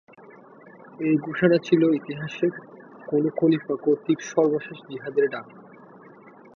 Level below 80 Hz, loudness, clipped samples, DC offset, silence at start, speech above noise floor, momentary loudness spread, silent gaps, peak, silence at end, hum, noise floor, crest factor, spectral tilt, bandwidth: -70 dBFS; -24 LUFS; under 0.1%; under 0.1%; 1 s; 25 dB; 14 LU; none; -6 dBFS; 0.95 s; none; -48 dBFS; 20 dB; -7 dB/octave; 6.8 kHz